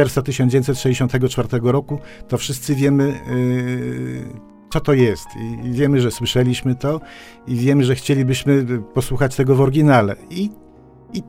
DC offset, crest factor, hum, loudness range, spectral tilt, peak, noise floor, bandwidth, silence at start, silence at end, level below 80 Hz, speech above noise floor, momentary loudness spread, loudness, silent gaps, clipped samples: under 0.1%; 16 dB; none; 3 LU; -6.5 dB/octave; -2 dBFS; -37 dBFS; 16.5 kHz; 0 s; 0 s; -40 dBFS; 19 dB; 12 LU; -18 LUFS; none; under 0.1%